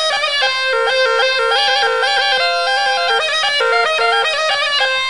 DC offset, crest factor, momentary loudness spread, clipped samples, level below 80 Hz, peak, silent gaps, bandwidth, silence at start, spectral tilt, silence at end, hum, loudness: 0.6%; 12 dB; 1 LU; under 0.1%; -58 dBFS; -2 dBFS; none; 11.5 kHz; 0 s; 1.5 dB/octave; 0 s; none; -14 LUFS